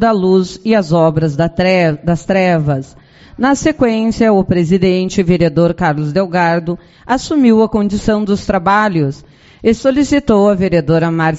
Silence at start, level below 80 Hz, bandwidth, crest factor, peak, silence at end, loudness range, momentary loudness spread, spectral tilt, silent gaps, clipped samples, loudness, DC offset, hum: 0 s; -36 dBFS; 8 kHz; 12 dB; 0 dBFS; 0 s; 1 LU; 6 LU; -6 dB/octave; none; under 0.1%; -13 LUFS; under 0.1%; none